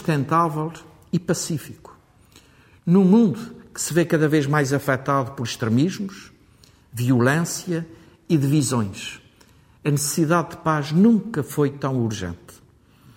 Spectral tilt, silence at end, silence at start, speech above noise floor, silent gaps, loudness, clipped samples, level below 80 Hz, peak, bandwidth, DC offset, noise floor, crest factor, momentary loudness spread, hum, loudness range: -6 dB/octave; 0.65 s; 0 s; 33 dB; none; -21 LUFS; under 0.1%; -58 dBFS; -4 dBFS; 16.5 kHz; under 0.1%; -53 dBFS; 18 dB; 15 LU; none; 3 LU